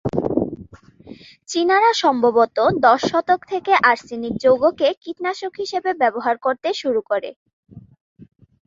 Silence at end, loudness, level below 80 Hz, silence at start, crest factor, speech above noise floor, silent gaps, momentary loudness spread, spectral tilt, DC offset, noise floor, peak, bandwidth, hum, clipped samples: 0.4 s; -19 LUFS; -54 dBFS; 0.05 s; 18 dB; 25 dB; 4.97-5.01 s, 7.36-7.46 s, 7.53-7.63 s, 8.01-8.16 s; 11 LU; -4.5 dB/octave; under 0.1%; -43 dBFS; -2 dBFS; 7.8 kHz; none; under 0.1%